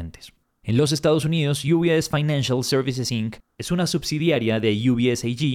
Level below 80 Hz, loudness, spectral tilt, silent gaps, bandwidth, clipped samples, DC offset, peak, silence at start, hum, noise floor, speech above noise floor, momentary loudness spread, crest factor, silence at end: -50 dBFS; -22 LUFS; -5.5 dB/octave; none; 16 kHz; under 0.1%; under 0.1%; -8 dBFS; 0 s; none; -49 dBFS; 28 dB; 8 LU; 14 dB; 0 s